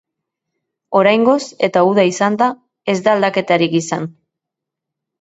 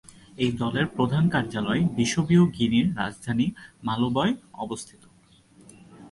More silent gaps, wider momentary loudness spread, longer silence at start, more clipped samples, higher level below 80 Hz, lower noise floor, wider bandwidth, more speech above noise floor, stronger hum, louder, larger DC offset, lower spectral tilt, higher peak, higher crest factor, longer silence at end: neither; second, 10 LU vs 13 LU; first, 0.9 s vs 0.4 s; neither; second, -64 dBFS vs -54 dBFS; first, -82 dBFS vs -57 dBFS; second, 8.2 kHz vs 11.5 kHz; first, 68 dB vs 33 dB; neither; first, -15 LUFS vs -25 LUFS; neither; about the same, -5 dB/octave vs -6 dB/octave; first, 0 dBFS vs -8 dBFS; about the same, 16 dB vs 16 dB; first, 1.1 s vs 0.05 s